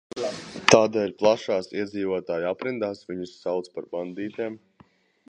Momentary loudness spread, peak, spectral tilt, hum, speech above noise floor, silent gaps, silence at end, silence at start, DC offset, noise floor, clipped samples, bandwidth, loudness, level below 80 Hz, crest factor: 15 LU; 0 dBFS; -4 dB/octave; none; 33 dB; none; 0.7 s; 0.15 s; under 0.1%; -58 dBFS; under 0.1%; 10.5 kHz; -26 LUFS; -62 dBFS; 26 dB